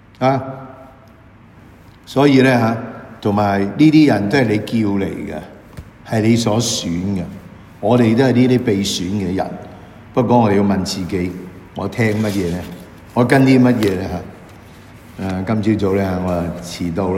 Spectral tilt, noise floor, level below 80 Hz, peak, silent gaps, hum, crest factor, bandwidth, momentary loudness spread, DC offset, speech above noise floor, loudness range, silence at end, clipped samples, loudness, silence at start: -6 dB/octave; -44 dBFS; -46 dBFS; 0 dBFS; none; none; 16 dB; 16 kHz; 19 LU; under 0.1%; 28 dB; 4 LU; 0 s; under 0.1%; -16 LUFS; 0.2 s